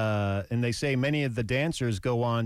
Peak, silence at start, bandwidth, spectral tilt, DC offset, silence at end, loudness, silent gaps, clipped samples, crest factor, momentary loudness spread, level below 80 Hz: -18 dBFS; 0 s; 14.5 kHz; -6 dB/octave; under 0.1%; 0 s; -28 LUFS; none; under 0.1%; 10 dB; 3 LU; -52 dBFS